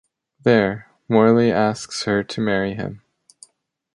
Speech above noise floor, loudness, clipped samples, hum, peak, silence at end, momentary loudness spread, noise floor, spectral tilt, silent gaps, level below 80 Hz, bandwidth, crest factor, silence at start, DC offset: 48 dB; -19 LUFS; under 0.1%; none; -2 dBFS; 0.95 s; 12 LU; -66 dBFS; -6 dB/octave; none; -54 dBFS; 11.5 kHz; 18 dB; 0.45 s; under 0.1%